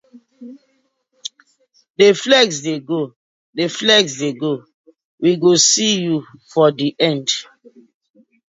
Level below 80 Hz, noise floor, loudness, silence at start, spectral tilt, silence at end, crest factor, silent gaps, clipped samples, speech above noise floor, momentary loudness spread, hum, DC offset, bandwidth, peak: -66 dBFS; -64 dBFS; -16 LUFS; 0.15 s; -3 dB/octave; 1.05 s; 18 dB; 1.90-1.94 s, 3.16-3.53 s, 4.74-4.84 s, 5.04-5.18 s; under 0.1%; 47 dB; 18 LU; none; under 0.1%; 8 kHz; 0 dBFS